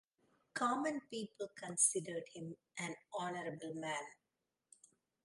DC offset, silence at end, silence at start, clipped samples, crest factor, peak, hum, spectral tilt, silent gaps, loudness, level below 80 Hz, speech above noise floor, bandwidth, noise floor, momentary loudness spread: under 0.1%; 1.1 s; 0.55 s; under 0.1%; 24 dB; -20 dBFS; none; -2.5 dB/octave; none; -40 LUFS; -88 dBFS; 48 dB; 11.5 kHz; -89 dBFS; 16 LU